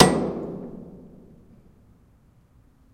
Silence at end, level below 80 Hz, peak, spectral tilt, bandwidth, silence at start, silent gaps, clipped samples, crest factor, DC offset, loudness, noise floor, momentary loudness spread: 1.95 s; -50 dBFS; 0 dBFS; -5 dB/octave; 16 kHz; 0 s; none; under 0.1%; 26 dB; under 0.1%; -25 LUFS; -57 dBFS; 26 LU